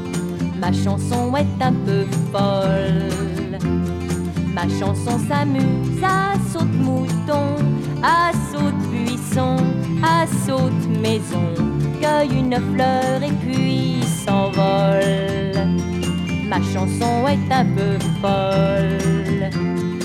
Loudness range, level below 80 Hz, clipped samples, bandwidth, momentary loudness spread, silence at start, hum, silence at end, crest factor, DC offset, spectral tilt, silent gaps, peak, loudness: 2 LU; -40 dBFS; under 0.1%; 14 kHz; 5 LU; 0 s; none; 0 s; 14 dB; under 0.1%; -6.5 dB/octave; none; -4 dBFS; -19 LUFS